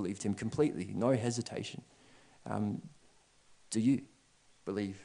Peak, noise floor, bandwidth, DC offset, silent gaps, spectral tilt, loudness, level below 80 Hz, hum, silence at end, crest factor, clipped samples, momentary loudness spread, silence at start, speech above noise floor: -16 dBFS; -66 dBFS; 10 kHz; under 0.1%; none; -6 dB/octave; -35 LUFS; -72 dBFS; none; 0 s; 20 dB; under 0.1%; 13 LU; 0 s; 32 dB